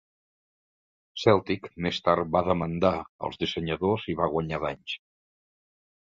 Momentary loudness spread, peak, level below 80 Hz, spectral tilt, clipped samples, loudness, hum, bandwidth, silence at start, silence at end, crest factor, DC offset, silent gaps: 12 LU; -6 dBFS; -52 dBFS; -6.5 dB/octave; under 0.1%; -27 LUFS; none; 7.6 kHz; 1.15 s; 1.05 s; 24 dB; under 0.1%; 3.09-3.19 s